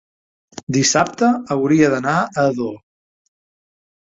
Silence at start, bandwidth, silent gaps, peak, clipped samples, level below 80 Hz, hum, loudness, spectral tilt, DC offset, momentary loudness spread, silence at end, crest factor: 0.55 s; 7.8 kHz; 0.63-0.67 s; -2 dBFS; under 0.1%; -58 dBFS; none; -17 LUFS; -4.5 dB/octave; under 0.1%; 10 LU; 1.4 s; 18 dB